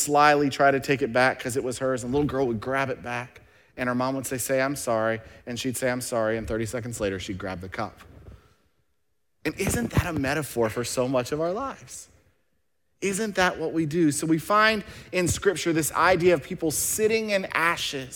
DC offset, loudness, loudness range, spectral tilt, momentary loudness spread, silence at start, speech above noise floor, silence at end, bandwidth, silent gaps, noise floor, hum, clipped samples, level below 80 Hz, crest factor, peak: under 0.1%; -25 LUFS; 7 LU; -4 dB/octave; 12 LU; 0 s; 53 dB; 0 s; 18 kHz; none; -78 dBFS; none; under 0.1%; -50 dBFS; 20 dB; -6 dBFS